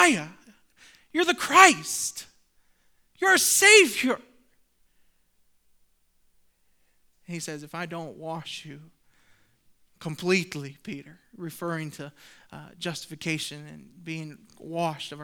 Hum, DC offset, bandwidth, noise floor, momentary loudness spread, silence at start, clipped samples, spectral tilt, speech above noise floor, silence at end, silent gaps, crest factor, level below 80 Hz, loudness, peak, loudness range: none; under 0.1%; over 20 kHz; -65 dBFS; 25 LU; 0 s; under 0.1%; -2 dB/octave; 40 dB; 0 s; none; 28 dB; -70 dBFS; -22 LUFS; 0 dBFS; 19 LU